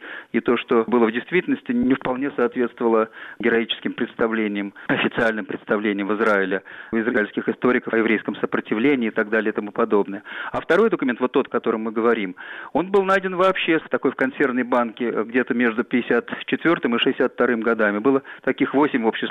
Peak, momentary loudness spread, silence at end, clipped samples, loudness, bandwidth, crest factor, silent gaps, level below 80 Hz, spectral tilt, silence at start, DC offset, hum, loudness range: -8 dBFS; 6 LU; 0 s; under 0.1%; -21 LUFS; 8.4 kHz; 14 dB; none; -62 dBFS; -7 dB/octave; 0 s; under 0.1%; none; 2 LU